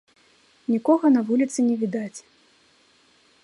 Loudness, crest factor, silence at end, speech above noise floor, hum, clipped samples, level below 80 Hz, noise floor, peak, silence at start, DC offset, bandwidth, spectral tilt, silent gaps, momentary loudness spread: -22 LUFS; 18 dB; 1.25 s; 38 dB; none; under 0.1%; -76 dBFS; -59 dBFS; -6 dBFS; 0.7 s; under 0.1%; 11.5 kHz; -6 dB/octave; none; 17 LU